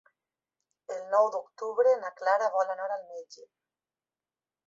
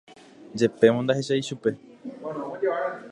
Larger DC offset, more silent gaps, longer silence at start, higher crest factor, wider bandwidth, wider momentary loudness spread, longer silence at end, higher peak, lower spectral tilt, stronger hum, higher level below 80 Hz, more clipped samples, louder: neither; neither; first, 0.9 s vs 0.1 s; about the same, 20 dB vs 22 dB; second, 7.6 kHz vs 11 kHz; second, 15 LU vs 18 LU; first, 1.25 s vs 0 s; second, -12 dBFS vs -4 dBFS; second, -2 dB/octave vs -6 dB/octave; neither; second, -86 dBFS vs -70 dBFS; neither; second, -28 LUFS vs -25 LUFS